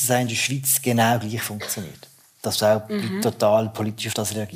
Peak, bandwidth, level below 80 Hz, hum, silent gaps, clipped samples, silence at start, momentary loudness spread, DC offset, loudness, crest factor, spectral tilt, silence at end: -6 dBFS; 16 kHz; -66 dBFS; none; none; under 0.1%; 0 s; 9 LU; under 0.1%; -22 LUFS; 16 dB; -4 dB/octave; 0 s